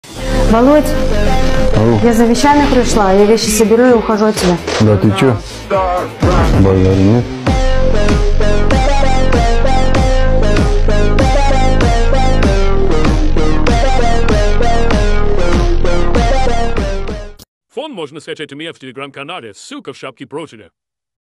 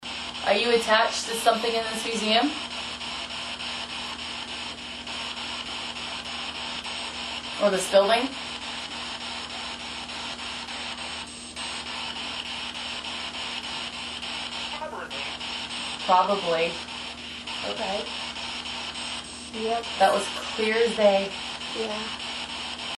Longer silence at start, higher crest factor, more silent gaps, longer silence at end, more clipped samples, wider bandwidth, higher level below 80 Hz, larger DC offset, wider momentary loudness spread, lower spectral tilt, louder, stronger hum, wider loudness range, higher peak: about the same, 0.05 s vs 0 s; second, 10 dB vs 22 dB; first, 17.48-17.61 s vs none; first, 0.8 s vs 0 s; neither; about the same, 12.5 kHz vs 12 kHz; first, -14 dBFS vs -56 dBFS; neither; first, 16 LU vs 11 LU; first, -6 dB/octave vs -2.5 dB/octave; first, -12 LUFS vs -27 LUFS; neither; first, 12 LU vs 7 LU; first, 0 dBFS vs -6 dBFS